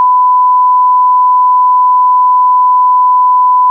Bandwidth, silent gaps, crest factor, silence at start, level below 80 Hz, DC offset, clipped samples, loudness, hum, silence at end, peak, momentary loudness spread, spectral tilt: 1.1 kHz; none; 4 dB; 0 s; under -90 dBFS; under 0.1%; under 0.1%; -7 LUFS; none; 0 s; -4 dBFS; 0 LU; -4 dB/octave